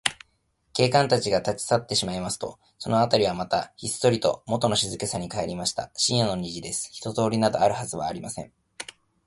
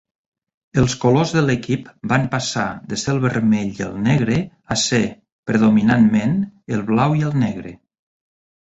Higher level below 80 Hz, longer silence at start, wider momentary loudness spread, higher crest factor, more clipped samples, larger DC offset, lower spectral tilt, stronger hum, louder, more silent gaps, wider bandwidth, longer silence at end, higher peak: second, -54 dBFS vs -46 dBFS; second, 0.05 s vs 0.75 s; first, 13 LU vs 10 LU; first, 24 dB vs 16 dB; neither; neither; second, -4 dB/octave vs -5.5 dB/octave; neither; second, -25 LUFS vs -19 LUFS; second, none vs 5.32-5.43 s; first, 12 kHz vs 8 kHz; second, 0.4 s vs 0.9 s; about the same, -2 dBFS vs -2 dBFS